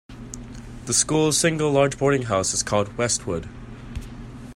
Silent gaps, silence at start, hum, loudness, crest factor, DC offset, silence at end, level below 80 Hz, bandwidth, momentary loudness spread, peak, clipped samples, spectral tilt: none; 0.1 s; none; -21 LUFS; 20 dB; under 0.1%; 0 s; -42 dBFS; 16 kHz; 20 LU; -4 dBFS; under 0.1%; -3.5 dB/octave